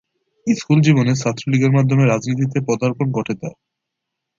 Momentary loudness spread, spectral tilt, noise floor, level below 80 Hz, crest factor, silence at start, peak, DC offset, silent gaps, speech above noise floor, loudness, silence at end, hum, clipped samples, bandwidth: 11 LU; -7 dB/octave; -80 dBFS; -56 dBFS; 16 dB; 0.45 s; -2 dBFS; under 0.1%; none; 63 dB; -17 LUFS; 0.9 s; none; under 0.1%; 7.6 kHz